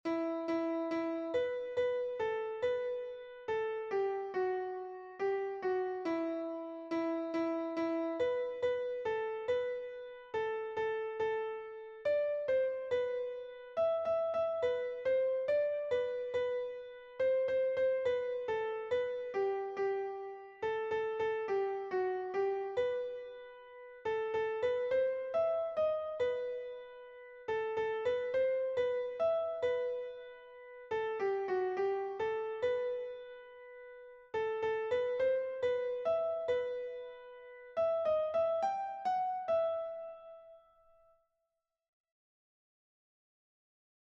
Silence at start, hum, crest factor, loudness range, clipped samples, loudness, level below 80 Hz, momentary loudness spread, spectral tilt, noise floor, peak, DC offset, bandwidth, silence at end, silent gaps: 0.05 s; none; 14 dB; 3 LU; under 0.1%; -36 LUFS; -74 dBFS; 13 LU; -6 dB/octave; -87 dBFS; -22 dBFS; under 0.1%; 7.2 kHz; 3.55 s; none